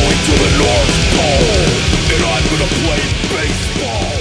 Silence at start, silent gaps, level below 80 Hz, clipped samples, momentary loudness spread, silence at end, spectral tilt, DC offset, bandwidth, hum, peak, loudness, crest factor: 0 s; none; -20 dBFS; under 0.1%; 5 LU; 0 s; -4 dB/octave; under 0.1%; 11 kHz; none; -2 dBFS; -13 LUFS; 12 dB